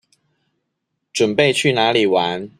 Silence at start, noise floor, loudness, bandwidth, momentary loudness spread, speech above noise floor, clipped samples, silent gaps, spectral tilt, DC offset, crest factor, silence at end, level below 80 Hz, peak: 1.15 s; -75 dBFS; -16 LUFS; 14 kHz; 5 LU; 59 dB; under 0.1%; none; -4 dB/octave; under 0.1%; 18 dB; 0.1 s; -62 dBFS; -2 dBFS